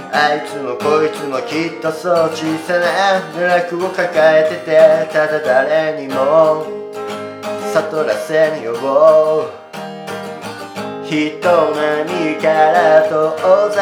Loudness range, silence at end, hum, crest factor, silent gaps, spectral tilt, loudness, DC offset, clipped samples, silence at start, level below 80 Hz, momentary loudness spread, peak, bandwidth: 3 LU; 0 s; none; 14 dB; none; -5 dB/octave; -14 LUFS; under 0.1%; under 0.1%; 0 s; -72 dBFS; 15 LU; 0 dBFS; 15.5 kHz